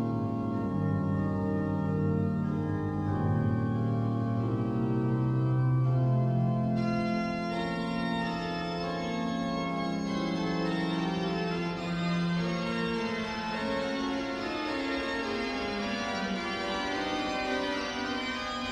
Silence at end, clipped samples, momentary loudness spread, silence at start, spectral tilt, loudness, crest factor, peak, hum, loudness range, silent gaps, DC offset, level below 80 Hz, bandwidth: 0 s; under 0.1%; 4 LU; 0 s; -7 dB/octave; -31 LUFS; 12 dB; -18 dBFS; none; 3 LU; none; under 0.1%; -54 dBFS; 9.8 kHz